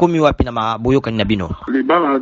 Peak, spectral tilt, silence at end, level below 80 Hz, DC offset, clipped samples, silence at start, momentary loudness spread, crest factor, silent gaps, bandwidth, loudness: 0 dBFS; -5.5 dB/octave; 0 s; -32 dBFS; under 0.1%; under 0.1%; 0 s; 5 LU; 16 dB; none; 7.6 kHz; -17 LUFS